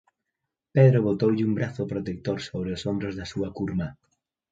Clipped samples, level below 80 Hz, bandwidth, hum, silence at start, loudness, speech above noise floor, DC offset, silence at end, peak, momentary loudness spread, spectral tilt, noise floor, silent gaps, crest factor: under 0.1%; -52 dBFS; 7.8 kHz; none; 0.75 s; -26 LUFS; 60 dB; under 0.1%; 0.6 s; -4 dBFS; 13 LU; -8 dB/octave; -84 dBFS; none; 20 dB